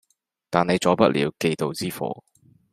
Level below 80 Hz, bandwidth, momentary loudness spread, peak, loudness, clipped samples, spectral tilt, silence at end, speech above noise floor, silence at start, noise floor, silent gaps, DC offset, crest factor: -60 dBFS; 15.5 kHz; 12 LU; -2 dBFS; -23 LUFS; under 0.1%; -5.5 dB/octave; 0.6 s; 36 dB; 0.5 s; -58 dBFS; none; under 0.1%; 22 dB